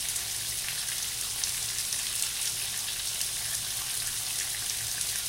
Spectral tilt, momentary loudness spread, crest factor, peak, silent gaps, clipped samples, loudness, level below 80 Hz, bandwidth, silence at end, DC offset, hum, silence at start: 1 dB/octave; 2 LU; 24 dB; -8 dBFS; none; under 0.1%; -29 LUFS; -56 dBFS; 17 kHz; 0 s; under 0.1%; none; 0 s